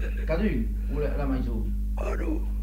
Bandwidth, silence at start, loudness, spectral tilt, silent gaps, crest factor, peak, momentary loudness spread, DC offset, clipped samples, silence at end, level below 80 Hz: 6.8 kHz; 0 s; -29 LUFS; -8.5 dB/octave; none; 12 dB; -14 dBFS; 4 LU; under 0.1%; under 0.1%; 0 s; -28 dBFS